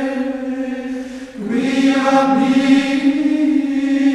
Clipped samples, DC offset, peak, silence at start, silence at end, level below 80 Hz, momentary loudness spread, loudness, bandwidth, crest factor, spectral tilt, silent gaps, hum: under 0.1%; under 0.1%; -2 dBFS; 0 s; 0 s; -52 dBFS; 12 LU; -16 LUFS; 10.5 kHz; 14 dB; -5 dB/octave; none; none